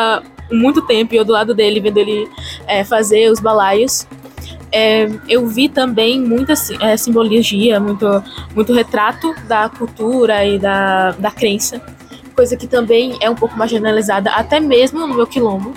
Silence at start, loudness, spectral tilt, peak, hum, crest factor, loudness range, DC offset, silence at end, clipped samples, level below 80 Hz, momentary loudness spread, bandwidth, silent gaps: 0 s; -14 LUFS; -4 dB/octave; -2 dBFS; none; 12 dB; 2 LU; under 0.1%; 0 s; under 0.1%; -42 dBFS; 7 LU; 17 kHz; none